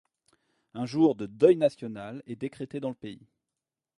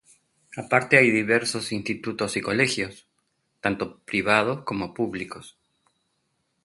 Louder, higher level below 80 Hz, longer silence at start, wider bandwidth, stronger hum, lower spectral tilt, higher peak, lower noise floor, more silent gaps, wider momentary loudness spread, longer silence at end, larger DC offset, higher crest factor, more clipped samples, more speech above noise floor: second, -27 LUFS vs -23 LUFS; second, -70 dBFS vs -60 dBFS; first, 0.75 s vs 0.5 s; about the same, 11 kHz vs 12 kHz; neither; first, -7.5 dB/octave vs -4.5 dB/octave; second, -6 dBFS vs 0 dBFS; first, -89 dBFS vs -74 dBFS; neither; first, 19 LU vs 16 LU; second, 0.85 s vs 1.15 s; neither; about the same, 22 dB vs 26 dB; neither; first, 62 dB vs 49 dB